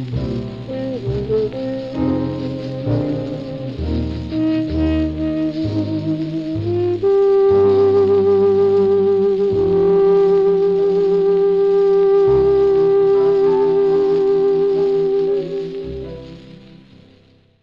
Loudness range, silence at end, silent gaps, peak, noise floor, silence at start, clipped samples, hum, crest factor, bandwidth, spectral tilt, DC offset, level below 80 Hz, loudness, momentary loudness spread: 8 LU; 1.1 s; none; -6 dBFS; -51 dBFS; 0 s; under 0.1%; none; 10 dB; 5.6 kHz; -9.5 dB/octave; 0.2%; -38 dBFS; -16 LUFS; 11 LU